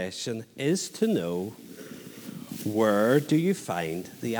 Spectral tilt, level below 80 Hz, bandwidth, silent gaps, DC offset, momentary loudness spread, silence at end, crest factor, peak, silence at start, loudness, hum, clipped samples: -5.5 dB/octave; -70 dBFS; over 20 kHz; none; under 0.1%; 19 LU; 0 s; 20 dB; -8 dBFS; 0 s; -27 LUFS; none; under 0.1%